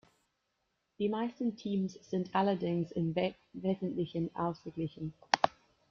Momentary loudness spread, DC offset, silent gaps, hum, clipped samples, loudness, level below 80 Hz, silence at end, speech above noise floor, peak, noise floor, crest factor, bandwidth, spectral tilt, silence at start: 8 LU; under 0.1%; none; none; under 0.1%; -35 LUFS; -70 dBFS; 0.4 s; 47 dB; -6 dBFS; -81 dBFS; 30 dB; 7 kHz; -6.5 dB/octave; 1 s